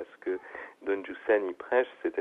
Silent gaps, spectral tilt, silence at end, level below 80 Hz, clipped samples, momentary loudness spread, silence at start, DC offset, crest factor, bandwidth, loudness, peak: none; -6 dB/octave; 0 s; -72 dBFS; under 0.1%; 10 LU; 0 s; under 0.1%; 18 dB; 4 kHz; -31 LUFS; -14 dBFS